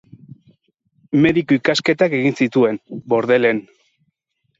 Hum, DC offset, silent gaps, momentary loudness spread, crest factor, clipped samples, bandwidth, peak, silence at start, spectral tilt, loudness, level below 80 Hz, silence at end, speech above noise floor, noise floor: none; under 0.1%; none; 6 LU; 16 dB; under 0.1%; 7.8 kHz; -2 dBFS; 1.1 s; -6 dB/octave; -17 LUFS; -58 dBFS; 1 s; 54 dB; -71 dBFS